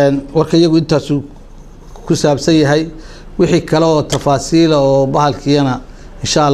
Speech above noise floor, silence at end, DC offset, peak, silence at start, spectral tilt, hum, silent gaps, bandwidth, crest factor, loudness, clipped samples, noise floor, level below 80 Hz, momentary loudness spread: 22 dB; 0 s; under 0.1%; 0 dBFS; 0 s; -6 dB/octave; none; none; 13 kHz; 12 dB; -13 LUFS; under 0.1%; -34 dBFS; -34 dBFS; 8 LU